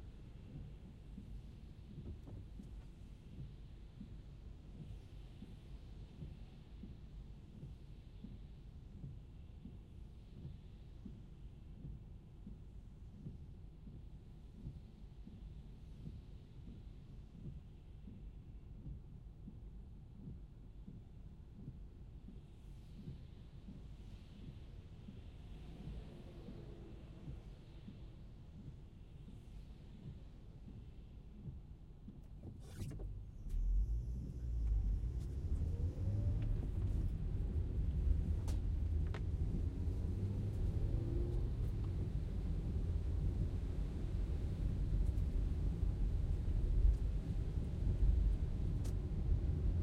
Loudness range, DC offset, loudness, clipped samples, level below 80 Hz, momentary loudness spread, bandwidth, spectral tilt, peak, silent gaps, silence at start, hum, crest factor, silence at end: 16 LU; under 0.1%; -44 LUFS; under 0.1%; -44 dBFS; 17 LU; 8.6 kHz; -8.5 dB/octave; -22 dBFS; none; 0 s; none; 20 dB; 0 s